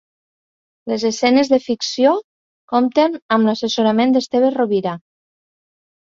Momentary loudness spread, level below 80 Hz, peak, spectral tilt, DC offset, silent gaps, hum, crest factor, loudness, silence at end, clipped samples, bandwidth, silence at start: 8 LU; -62 dBFS; 0 dBFS; -4.5 dB/octave; under 0.1%; 2.24-2.68 s, 3.22-3.29 s; none; 18 dB; -17 LUFS; 1.05 s; under 0.1%; 7.6 kHz; 0.85 s